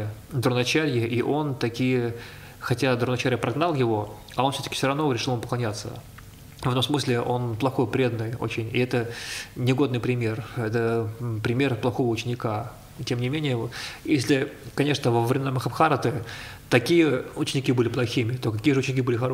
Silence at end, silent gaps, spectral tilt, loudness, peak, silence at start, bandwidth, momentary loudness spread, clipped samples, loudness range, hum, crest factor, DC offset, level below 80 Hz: 0 s; none; -6 dB/octave; -25 LUFS; -4 dBFS; 0 s; 16 kHz; 10 LU; under 0.1%; 3 LU; none; 22 dB; under 0.1%; -54 dBFS